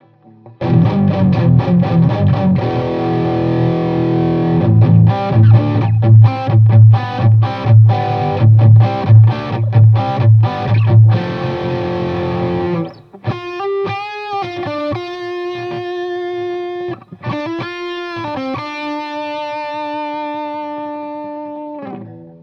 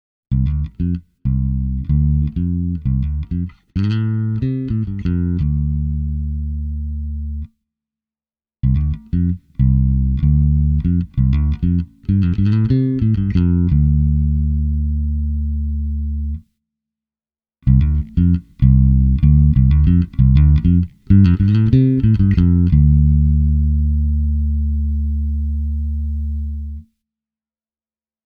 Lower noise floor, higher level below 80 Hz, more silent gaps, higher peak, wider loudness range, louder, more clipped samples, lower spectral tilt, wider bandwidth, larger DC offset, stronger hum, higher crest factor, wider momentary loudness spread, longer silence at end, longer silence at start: second, -42 dBFS vs under -90 dBFS; second, -42 dBFS vs -20 dBFS; neither; about the same, 0 dBFS vs 0 dBFS; first, 12 LU vs 9 LU; first, -14 LUFS vs -17 LUFS; neither; second, -9.5 dB/octave vs -11.5 dB/octave; first, 5.6 kHz vs 4.7 kHz; neither; neither; about the same, 12 dB vs 16 dB; first, 15 LU vs 11 LU; second, 0.1 s vs 1.45 s; first, 0.45 s vs 0.3 s